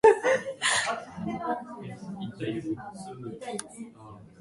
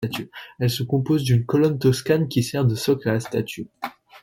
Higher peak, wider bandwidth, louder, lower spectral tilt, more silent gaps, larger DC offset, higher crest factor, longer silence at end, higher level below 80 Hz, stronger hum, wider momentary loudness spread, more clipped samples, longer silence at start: about the same, -8 dBFS vs -6 dBFS; second, 11.5 kHz vs 17 kHz; second, -30 LUFS vs -22 LUFS; second, -3.5 dB/octave vs -6.5 dB/octave; neither; neither; first, 22 dB vs 16 dB; about the same, 0.1 s vs 0.05 s; second, -64 dBFS vs -54 dBFS; neither; first, 19 LU vs 13 LU; neither; about the same, 0.05 s vs 0 s